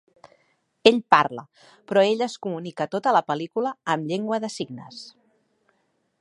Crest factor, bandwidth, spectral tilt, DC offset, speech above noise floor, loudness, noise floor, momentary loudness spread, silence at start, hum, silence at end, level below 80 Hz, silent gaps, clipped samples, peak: 24 dB; 11.5 kHz; -5 dB/octave; under 0.1%; 47 dB; -23 LUFS; -70 dBFS; 18 LU; 0.85 s; none; 1.1 s; -70 dBFS; none; under 0.1%; 0 dBFS